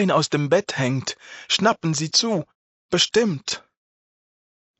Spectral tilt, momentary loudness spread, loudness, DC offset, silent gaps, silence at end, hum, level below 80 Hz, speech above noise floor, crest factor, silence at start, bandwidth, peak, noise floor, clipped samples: -3.5 dB/octave; 11 LU; -21 LUFS; under 0.1%; 2.55-2.89 s; 1.2 s; none; -64 dBFS; over 69 dB; 20 dB; 0 s; 8.2 kHz; -4 dBFS; under -90 dBFS; under 0.1%